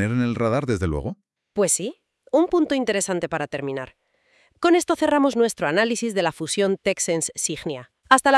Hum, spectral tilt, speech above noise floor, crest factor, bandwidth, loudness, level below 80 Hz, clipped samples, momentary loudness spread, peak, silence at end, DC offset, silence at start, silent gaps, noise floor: none; -4 dB/octave; 40 dB; 22 dB; 12 kHz; -22 LUFS; -48 dBFS; under 0.1%; 12 LU; 0 dBFS; 0 s; under 0.1%; 0 s; none; -62 dBFS